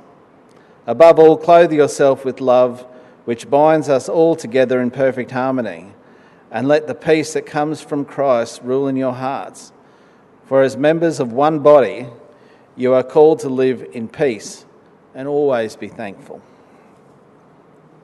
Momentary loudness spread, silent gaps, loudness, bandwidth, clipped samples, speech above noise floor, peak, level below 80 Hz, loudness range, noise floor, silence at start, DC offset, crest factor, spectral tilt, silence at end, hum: 18 LU; none; -15 LUFS; 12 kHz; under 0.1%; 33 dB; 0 dBFS; -64 dBFS; 8 LU; -48 dBFS; 0.85 s; under 0.1%; 16 dB; -6 dB/octave; 1.65 s; none